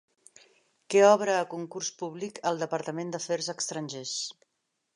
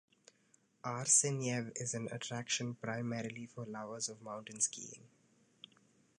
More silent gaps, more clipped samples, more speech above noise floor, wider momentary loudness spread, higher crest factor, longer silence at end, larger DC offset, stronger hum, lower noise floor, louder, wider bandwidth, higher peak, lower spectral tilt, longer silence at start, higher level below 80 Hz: neither; neither; first, 52 dB vs 34 dB; second, 14 LU vs 18 LU; about the same, 22 dB vs 24 dB; second, 0.65 s vs 1.1 s; neither; neither; first, -80 dBFS vs -73 dBFS; first, -28 LUFS vs -37 LUFS; about the same, 11 kHz vs 11 kHz; first, -6 dBFS vs -16 dBFS; about the same, -3.5 dB/octave vs -3 dB/octave; about the same, 0.9 s vs 0.85 s; about the same, -84 dBFS vs -82 dBFS